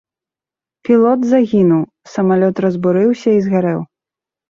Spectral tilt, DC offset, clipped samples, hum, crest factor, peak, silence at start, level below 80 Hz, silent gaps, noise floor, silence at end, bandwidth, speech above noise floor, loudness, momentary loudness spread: -8.5 dB/octave; under 0.1%; under 0.1%; none; 14 dB; -2 dBFS; 0.9 s; -56 dBFS; none; -89 dBFS; 0.65 s; 7.4 kHz; 76 dB; -14 LUFS; 11 LU